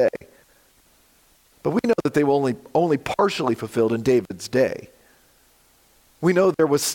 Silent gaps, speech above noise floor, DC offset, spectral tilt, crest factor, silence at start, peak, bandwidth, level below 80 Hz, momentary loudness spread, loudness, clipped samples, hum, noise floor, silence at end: none; 37 dB; under 0.1%; -5.5 dB/octave; 16 dB; 0 s; -8 dBFS; 17 kHz; -60 dBFS; 6 LU; -21 LUFS; under 0.1%; none; -58 dBFS; 0 s